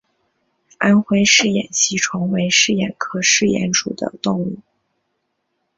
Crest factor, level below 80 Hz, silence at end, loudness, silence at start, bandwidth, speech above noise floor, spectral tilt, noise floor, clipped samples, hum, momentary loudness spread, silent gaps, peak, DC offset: 18 dB; -56 dBFS; 1.15 s; -16 LUFS; 0.8 s; 8 kHz; 54 dB; -3 dB/octave; -72 dBFS; under 0.1%; none; 11 LU; none; 0 dBFS; under 0.1%